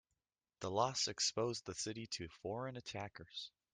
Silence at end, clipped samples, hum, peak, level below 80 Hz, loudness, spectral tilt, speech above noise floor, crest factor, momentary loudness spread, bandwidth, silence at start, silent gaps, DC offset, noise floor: 0.25 s; under 0.1%; none; -20 dBFS; -74 dBFS; -41 LUFS; -3 dB/octave; over 48 dB; 22 dB; 12 LU; 11.5 kHz; 0.6 s; none; under 0.1%; under -90 dBFS